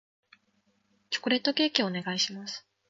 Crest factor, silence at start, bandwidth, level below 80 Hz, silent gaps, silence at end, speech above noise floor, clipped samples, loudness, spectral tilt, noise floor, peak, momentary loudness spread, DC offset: 26 dB; 1.1 s; 7.8 kHz; -80 dBFS; none; 0.3 s; 43 dB; under 0.1%; -28 LUFS; -3 dB/octave; -72 dBFS; -6 dBFS; 11 LU; under 0.1%